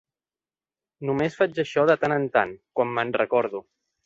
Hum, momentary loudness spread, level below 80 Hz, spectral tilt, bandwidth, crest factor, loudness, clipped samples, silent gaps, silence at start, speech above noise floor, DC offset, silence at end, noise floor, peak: none; 8 LU; -66 dBFS; -6.5 dB/octave; 7.8 kHz; 20 dB; -24 LUFS; under 0.1%; none; 1 s; over 67 dB; under 0.1%; 0.45 s; under -90 dBFS; -4 dBFS